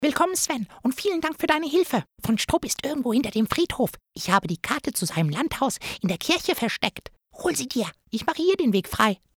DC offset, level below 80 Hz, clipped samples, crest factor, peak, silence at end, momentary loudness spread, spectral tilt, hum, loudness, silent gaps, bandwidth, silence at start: under 0.1%; -50 dBFS; under 0.1%; 20 dB; -4 dBFS; 0.2 s; 6 LU; -4 dB/octave; none; -25 LUFS; none; over 20 kHz; 0 s